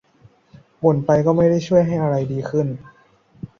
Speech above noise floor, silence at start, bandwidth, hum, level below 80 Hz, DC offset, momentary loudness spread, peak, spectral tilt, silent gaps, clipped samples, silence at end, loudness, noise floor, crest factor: 35 dB; 0.8 s; 7.2 kHz; none; -52 dBFS; under 0.1%; 10 LU; -2 dBFS; -8.5 dB/octave; none; under 0.1%; 0.15 s; -18 LUFS; -53 dBFS; 18 dB